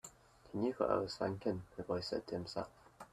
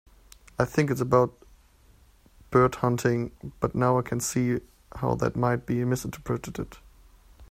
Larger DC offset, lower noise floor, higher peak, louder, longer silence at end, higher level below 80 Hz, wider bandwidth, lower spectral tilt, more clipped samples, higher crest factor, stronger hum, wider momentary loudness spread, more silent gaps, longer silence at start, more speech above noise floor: neither; about the same, -59 dBFS vs -57 dBFS; second, -18 dBFS vs -6 dBFS; second, -40 LUFS vs -27 LUFS; about the same, 0.05 s vs 0.05 s; second, -68 dBFS vs -50 dBFS; second, 14 kHz vs 16 kHz; about the same, -6 dB/octave vs -6.5 dB/octave; neither; about the same, 22 dB vs 20 dB; neither; about the same, 13 LU vs 12 LU; neither; second, 0.05 s vs 0.6 s; second, 20 dB vs 32 dB